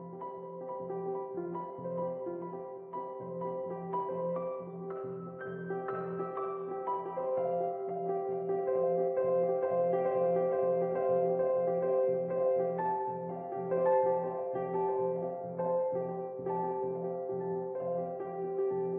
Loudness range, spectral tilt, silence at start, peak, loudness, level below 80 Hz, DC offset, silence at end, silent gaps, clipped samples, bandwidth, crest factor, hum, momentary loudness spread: 8 LU; -9 dB/octave; 0 s; -18 dBFS; -34 LUFS; -80 dBFS; under 0.1%; 0 s; none; under 0.1%; 3.3 kHz; 14 dB; none; 11 LU